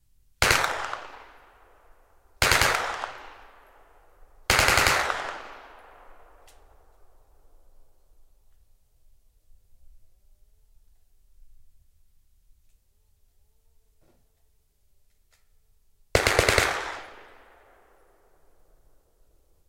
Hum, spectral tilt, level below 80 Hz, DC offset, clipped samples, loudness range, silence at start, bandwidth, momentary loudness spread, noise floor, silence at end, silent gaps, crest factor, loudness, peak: none; -2 dB/octave; -44 dBFS; under 0.1%; under 0.1%; 7 LU; 0.4 s; 16 kHz; 25 LU; -65 dBFS; 2.5 s; none; 32 dB; -23 LUFS; 0 dBFS